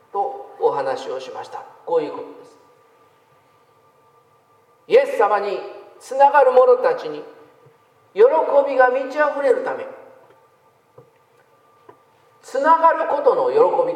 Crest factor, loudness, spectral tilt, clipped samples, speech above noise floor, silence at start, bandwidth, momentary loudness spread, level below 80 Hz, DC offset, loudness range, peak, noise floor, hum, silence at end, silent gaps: 18 dB; -18 LUFS; -4.5 dB/octave; under 0.1%; 39 dB; 0.15 s; 11 kHz; 19 LU; -84 dBFS; under 0.1%; 13 LU; -2 dBFS; -57 dBFS; none; 0 s; none